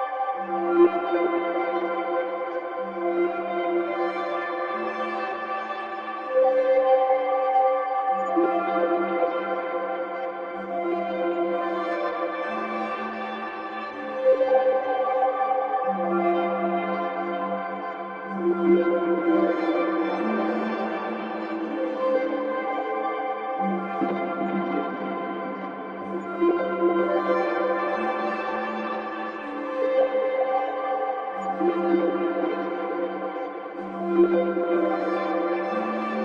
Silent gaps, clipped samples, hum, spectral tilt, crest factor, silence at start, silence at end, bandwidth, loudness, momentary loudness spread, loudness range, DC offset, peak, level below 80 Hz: none; under 0.1%; none; -8 dB/octave; 18 dB; 0 s; 0 s; 5.6 kHz; -25 LUFS; 10 LU; 4 LU; under 0.1%; -8 dBFS; -72 dBFS